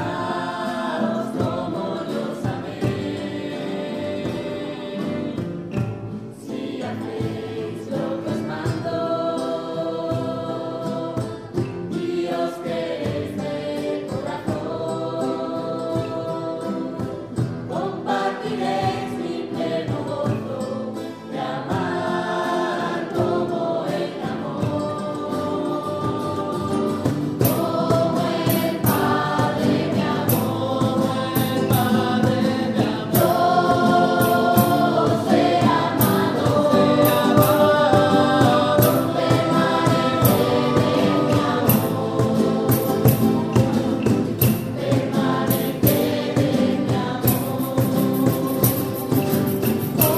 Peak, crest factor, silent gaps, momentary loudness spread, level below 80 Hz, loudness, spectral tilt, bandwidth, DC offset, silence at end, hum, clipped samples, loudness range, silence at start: 0 dBFS; 20 dB; none; 10 LU; -50 dBFS; -21 LUFS; -6 dB/octave; 15.5 kHz; under 0.1%; 0 s; none; under 0.1%; 9 LU; 0 s